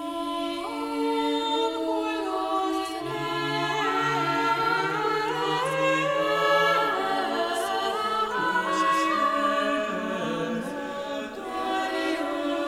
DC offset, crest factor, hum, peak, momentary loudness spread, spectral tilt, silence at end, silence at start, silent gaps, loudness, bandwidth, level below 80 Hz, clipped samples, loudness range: under 0.1%; 16 dB; none; -10 dBFS; 8 LU; -4 dB/octave; 0 s; 0 s; none; -26 LUFS; 17 kHz; -62 dBFS; under 0.1%; 4 LU